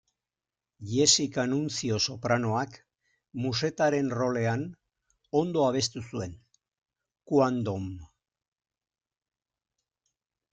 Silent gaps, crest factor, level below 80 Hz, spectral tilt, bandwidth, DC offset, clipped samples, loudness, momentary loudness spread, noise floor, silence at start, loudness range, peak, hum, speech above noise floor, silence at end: none; 24 dB; -64 dBFS; -4 dB/octave; 9.6 kHz; under 0.1%; under 0.1%; -28 LUFS; 14 LU; under -90 dBFS; 0.8 s; 6 LU; -6 dBFS; none; over 62 dB; 2.45 s